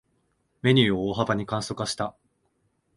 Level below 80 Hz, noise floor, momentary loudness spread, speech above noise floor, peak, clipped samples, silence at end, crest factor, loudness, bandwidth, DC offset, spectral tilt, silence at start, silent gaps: -56 dBFS; -71 dBFS; 10 LU; 47 dB; -6 dBFS; under 0.1%; 0.85 s; 22 dB; -25 LUFS; 11.5 kHz; under 0.1%; -5.5 dB/octave; 0.65 s; none